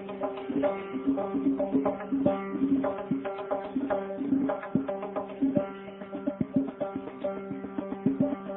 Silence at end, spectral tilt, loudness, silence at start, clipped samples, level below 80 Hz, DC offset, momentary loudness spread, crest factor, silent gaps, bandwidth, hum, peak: 0 s; -11.5 dB/octave; -31 LUFS; 0 s; under 0.1%; -62 dBFS; under 0.1%; 7 LU; 20 dB; none; 3.8 kHz; none; -10 dBFS